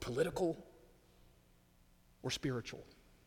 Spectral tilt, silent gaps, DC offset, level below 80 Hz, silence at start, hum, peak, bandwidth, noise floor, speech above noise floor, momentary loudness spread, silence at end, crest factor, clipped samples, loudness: -5 dB/octave; none; under 0.1%; -64 dBFS; 0 s; none; -22 dBFS; 19 kHz; -68 dBFS; 29 dB; 21 LU; 0.35 s; 20 dB; under 0.1%; -40 LUFS